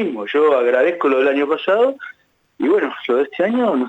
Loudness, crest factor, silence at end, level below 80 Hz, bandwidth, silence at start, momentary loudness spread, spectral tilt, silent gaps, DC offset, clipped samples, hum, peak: -17 LUFS; 12 dB; 0 s; -72 dBFS; 8 kHz; 0 s; 5 LU; -6.5 dB/octave; none; under 0.1%; under 0.1%; none; -6 dBFS